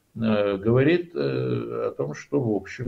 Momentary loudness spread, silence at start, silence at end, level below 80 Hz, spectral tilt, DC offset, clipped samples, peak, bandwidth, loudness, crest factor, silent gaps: 8 LU; 0.15 s; 0 s; -60 dBFS; -8 dB/octave; under 0.1%; under 0.1%; -8 dBFS; 7.4 kHz; -24 LUFS; 16 dB; none